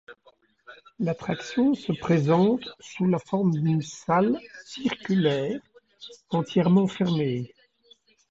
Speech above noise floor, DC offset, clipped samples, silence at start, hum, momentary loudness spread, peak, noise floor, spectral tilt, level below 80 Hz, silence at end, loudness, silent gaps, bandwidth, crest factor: 37 dB; under 0.1%; under 0.1%; 0.1 s; none; 13 LU; -8 dBFS; -61 dBFS; -7 dB/octave; -64 dBFS; 0.85 s; -25 LUFS; none; 7.8 kHz; 18 dB